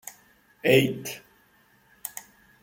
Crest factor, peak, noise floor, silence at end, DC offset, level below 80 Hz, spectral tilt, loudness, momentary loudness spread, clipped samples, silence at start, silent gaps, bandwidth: 22 dB; -6 dBFS; -61 dBFS; 0.4 s; under 0.1%; -68 dBFS; -4.5 dB/octave; -25 LUFS; 22 LU; under 0.1%; 0.05 s; none; 17 kHz